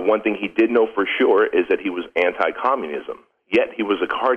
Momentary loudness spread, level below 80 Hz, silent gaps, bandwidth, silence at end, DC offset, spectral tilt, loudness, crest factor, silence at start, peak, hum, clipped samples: 8 LU; -60 dBFS; none; 6 kHz; 0 s; under 0.1%; -6 dB/octave; -20 LUFS; 16 dB; 0 s; -4 dBFS; none; under 0.1%